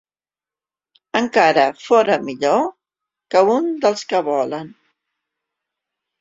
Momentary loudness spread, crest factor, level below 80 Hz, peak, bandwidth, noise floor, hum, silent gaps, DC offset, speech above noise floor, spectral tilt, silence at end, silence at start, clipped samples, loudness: 10 LU; 18 dB; -66 dBFS; 0 dBFS; 7.8 kHz; under -90 dBFS; none; none; under 0.1%; over 73 dB; -4.5 dB/octave; 1.5 s; 1.15 s; under 0.1%; -17 LUFS